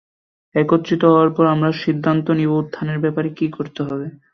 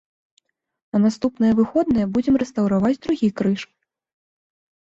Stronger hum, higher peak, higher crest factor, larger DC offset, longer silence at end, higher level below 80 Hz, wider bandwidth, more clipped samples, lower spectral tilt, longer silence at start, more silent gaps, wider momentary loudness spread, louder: neither; first, -2 dBFS vs -6 dBFS; about the same, 16 dB vs 14 dB; neither; second, 0.2 s vs 1.2 s; second, -60 dBFS vs -52 dBFS; second, 6.4 kHz vs 7.8 kHz; neither; about the same, -8.5 dB/octave vs -7.5 dB/octave; second, 0.55 s vs 0.95 s; neither; first, 11 LU vs 5 LU; about the same, -18 LUFS vs -20 LUFS